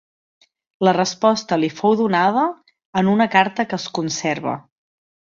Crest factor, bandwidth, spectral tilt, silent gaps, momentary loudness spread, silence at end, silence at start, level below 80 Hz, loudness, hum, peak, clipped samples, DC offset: 18 dB; 7.6 kHz; -5 dB/octave; 2.85-2.93 s; 8 LU; 0.8 s; 0.8 s; -64 dBFS; -19 LUFS; none; -2 dBFS; under 0.1%; under 0.1%